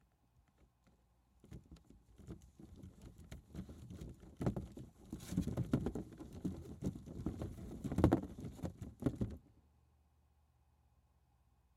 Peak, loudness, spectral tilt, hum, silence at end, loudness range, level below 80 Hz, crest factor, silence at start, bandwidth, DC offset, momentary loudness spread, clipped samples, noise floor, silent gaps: -14 dBFS; -43 LUFS; -8 dB/octave; none; 2.15 s; 16 LU; -56 dBFS; 30 dB; 1.45 s; 16 kHz; under 0.1%; 19 LU; under 0.1%; -74 dBFS; none